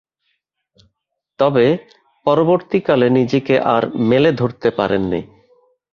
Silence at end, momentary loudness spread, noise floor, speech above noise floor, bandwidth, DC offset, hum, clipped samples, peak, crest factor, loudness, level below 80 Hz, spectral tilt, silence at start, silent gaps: 0.65 s; 6 LU; -75 dBFS; 60 dB; 6.8 kHz; under 0.1%; none; under 0.1%; -2 dBFS; 16 dB; -16 LUFS; -52 dBFS; -8 dB/octave; 1.4 s; none